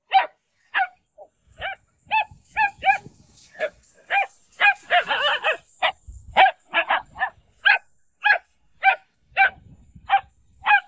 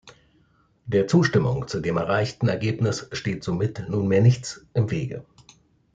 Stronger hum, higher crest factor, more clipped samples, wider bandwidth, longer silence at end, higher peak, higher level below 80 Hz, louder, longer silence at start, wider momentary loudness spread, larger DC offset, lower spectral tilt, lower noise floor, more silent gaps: neither; about the same, 22 dB vs 18 dB; neither; second, 8 kHz vs 9 kHz; second, 0.05 s vs 0.7 s; first, -2 dBFS vs -6 dBFS; about the same, -56 dBFS vs -54 dBFS; about the same, -22 LUFS vs -24 LUFS; about the same, 0.1 s vs 0.05 s; first, 13 LU vs 10 LU; neither; second, -2 dB/octave vs -6.5 dB/octave; second, -52 dBFS vs -62 dBFS; neither